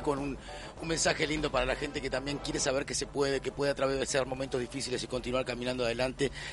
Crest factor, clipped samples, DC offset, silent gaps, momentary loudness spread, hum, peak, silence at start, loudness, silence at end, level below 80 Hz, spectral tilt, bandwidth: 18 dB; under 0.1%; under 0.1%; none; 5 LU; none; -14 dBFS; 0 s; -32 LUFS; 0 s; -48 dBFS; -3.5 dB/octave; 11.5 kHz